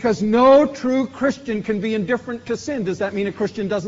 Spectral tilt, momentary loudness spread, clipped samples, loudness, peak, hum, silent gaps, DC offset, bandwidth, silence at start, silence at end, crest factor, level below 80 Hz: -5 dB/octave; 12 LU; under 0.1%; -19 LUFS; -4 dBFS; none; none; under 0.1%; 7.8 kHz; 0 s; 0 s; 16 dB; -54 dBFS